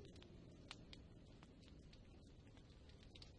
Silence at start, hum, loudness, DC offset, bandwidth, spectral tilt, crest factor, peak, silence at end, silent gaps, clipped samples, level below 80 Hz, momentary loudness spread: 0 s; none; -63 LUFS; under 0.1%; 10 kHz; -5 dB/octave; 26 dB; -36 dBFS; 0 s; none; under 0.1%; -68 dBFS; 6 LU